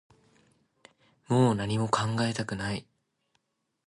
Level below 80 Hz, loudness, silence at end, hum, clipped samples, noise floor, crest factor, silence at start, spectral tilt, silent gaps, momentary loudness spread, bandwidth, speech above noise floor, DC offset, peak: -60 dBFS; -28 LUFS; 1.05 s; none; under 0.1%; -76 dBFS; 22 dB; 1.3 s; -6 dB/octave; none; 9 LU; 11.5 kHz; 49 dB; under 0.1%; -10 dBFS